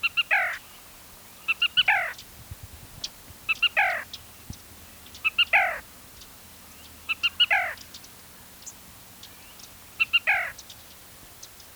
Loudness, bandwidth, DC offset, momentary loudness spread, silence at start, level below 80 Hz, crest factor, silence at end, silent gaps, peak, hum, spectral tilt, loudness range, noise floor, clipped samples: -23 LUFS; over 20 kHz; under 0.1%; 25 LU; 0 s; -58 dBFS; 20 dB; 0.05 s; none; -10 dBFS; none; -0.5 dB/octave; 4 LU; -48 dBFS; under 0.1%